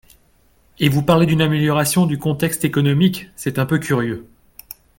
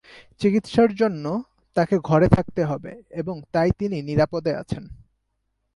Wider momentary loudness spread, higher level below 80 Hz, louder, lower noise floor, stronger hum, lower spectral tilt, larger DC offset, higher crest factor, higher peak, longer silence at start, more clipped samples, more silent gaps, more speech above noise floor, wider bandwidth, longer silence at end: about the same, 11 LU vs 13 LU; about the same, -48 dBFS vs -44 dBFS; first, -18 LUFS vs -22 LUFS; second, -56 dBFS vs -74 dBFS; neither; second, -5.5 dB/octave vs -8 dB/octave; neither; about the same, 18 dB vs 22 dB; about the same, 0 dBFS vs 0 dBFS; first, 0.8 s vs 0.15 s; neither; neither; second, 39 dB vs 53 dB; first, 17 kHz vs 11.5 kHz; about the same, 0.75 s vs 0.8 s